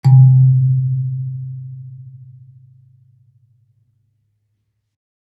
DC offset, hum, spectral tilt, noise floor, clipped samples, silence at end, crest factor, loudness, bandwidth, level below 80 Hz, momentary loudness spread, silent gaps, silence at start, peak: under 0.1%; none; -11 dB/octave; -69 dBFS; under 0.1%; 3.25 s; 16 dB; -14 LUFS; 4.6 kHz; -66 dBFS; 26 LU; none; 0.05 s; -2 dBFS